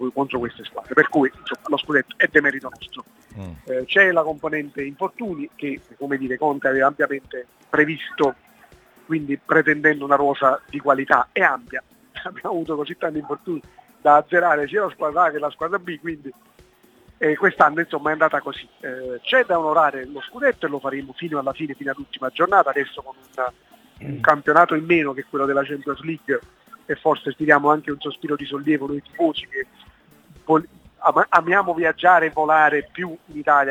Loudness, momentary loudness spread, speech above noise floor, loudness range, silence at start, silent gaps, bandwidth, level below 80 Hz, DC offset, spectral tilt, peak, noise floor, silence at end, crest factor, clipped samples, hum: -20 LUFS; 16 LU; 33 dB; 4 LU; 0 s; none; 18 kHz; -60 dBFS; under 0.1%; -6 dB/octave; 0 dBFS; -53 dBFS; 0 s; 22 dB; under 0.1%; none